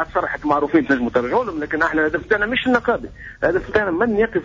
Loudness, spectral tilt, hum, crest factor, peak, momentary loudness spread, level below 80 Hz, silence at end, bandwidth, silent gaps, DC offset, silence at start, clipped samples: -19 LUFS; -6.5 dB/octave; none; 14 dB; -4 dBFS; 5 LU; -42 dBFS; 0 s; 7.6 kHz; none; under 0.1%; 0 s; under 0.1%